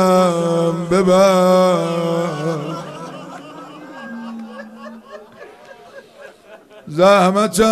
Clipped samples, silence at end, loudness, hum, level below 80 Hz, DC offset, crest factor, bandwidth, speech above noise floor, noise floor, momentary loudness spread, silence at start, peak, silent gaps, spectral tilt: under 0.1%; 0 s; -15 LUFS; none; -52 dBFS; under 0.1%; 16 dB; 14 kHz; 29 dB; -42 dBFS; 23 LU; 0 s; -2 dBFS; none; -5.5 dB/octave